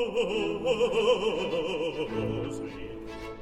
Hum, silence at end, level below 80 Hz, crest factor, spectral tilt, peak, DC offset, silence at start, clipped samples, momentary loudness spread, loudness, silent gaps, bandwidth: none; 0 s; -50 dBFS; 16 dB; -5 dB/octave; -12 dBFS; under 0.1%; 0 s; under 0.1%; 15 LU; -29 LUFS; none; 11.5 kHz